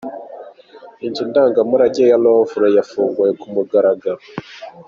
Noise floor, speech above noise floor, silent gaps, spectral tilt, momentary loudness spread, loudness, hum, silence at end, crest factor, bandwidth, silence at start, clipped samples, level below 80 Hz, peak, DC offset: -41 dBFS; 26 dB; none; -5 dB/octave; 19 LU; -15 LUFS; none; 0.05 s; 14 dB; 7.2 kHz; 0.05 s; under 0.1%; -62 dBFS; -2 dBFS; under 0.1%